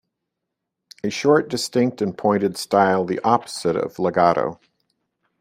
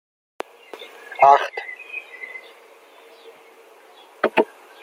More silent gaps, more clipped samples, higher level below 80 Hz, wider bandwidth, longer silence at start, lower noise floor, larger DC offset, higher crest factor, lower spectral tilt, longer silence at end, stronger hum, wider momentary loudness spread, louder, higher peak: neither; neither; first, -62 dBFS vs -78 dBFS; about the same, 16 kHz vs 16 kHz; first, 1.05 s vs 0.75 s; first, -81 dBFS vs -49 dBFS; neither; about the same, 20 dB vs 22 dB; about the same, -5 dB/octave vs -4 dB/octave; first, 0.85 s vs 0.4 s; neither; second, 6 LU vs 24 LU; about the same, -20 LUFS vs -20 LUFS; about the same, -2 dBFS vs -2 dBFS